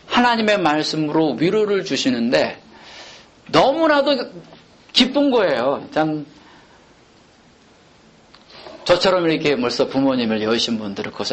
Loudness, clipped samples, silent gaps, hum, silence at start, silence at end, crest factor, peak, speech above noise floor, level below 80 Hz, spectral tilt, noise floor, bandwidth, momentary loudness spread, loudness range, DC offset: -18 LUFS; under 0.1%; none; none; 0.05 s; 0 s; 18 dB; -2 dBFS; 33 dB; -54 dBFS; -4.5 dB/octave; -51 dBFS; 8.8 kHz; 13 LU; 6 LU; under 0.1%